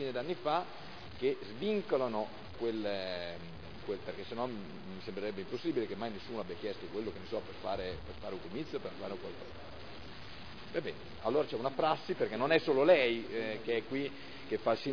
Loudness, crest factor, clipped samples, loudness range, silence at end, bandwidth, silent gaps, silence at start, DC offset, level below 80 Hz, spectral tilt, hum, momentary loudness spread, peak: -36 LUFS; 22 dB; under 0.1%; 11 LU; 0 s; 5.4 kHz; none; 0 s; 0.4%; -62 dBFS; -3.5 dB/octave; none; 16 LU; -14 dBFS